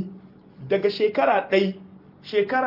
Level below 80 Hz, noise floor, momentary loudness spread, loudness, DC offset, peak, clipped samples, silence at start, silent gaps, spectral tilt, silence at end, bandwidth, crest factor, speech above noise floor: -70 dBFS; -46 dBFS; 21 LU; -23 LUFS; under 0.1%; -8 dBFS; under 0.1%; 0 s; none; -7 dB/octave; 0 s; 5.8 kHz; 16 dB; 24 dB